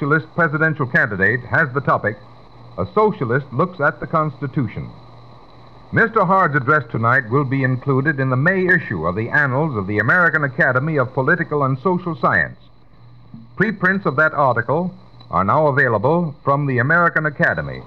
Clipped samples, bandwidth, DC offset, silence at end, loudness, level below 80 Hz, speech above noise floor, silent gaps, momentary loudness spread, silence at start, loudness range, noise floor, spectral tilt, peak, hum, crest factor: under 0.1%; 6.2 kHz; 0.4%; 0 s; -17 LUFS; -50 dBFS; 29 dB; none; 8 LU; 0 s; 4 LU; -47 dBFS; -9.5 dB/octave; -2 dBFS; none; 16 dB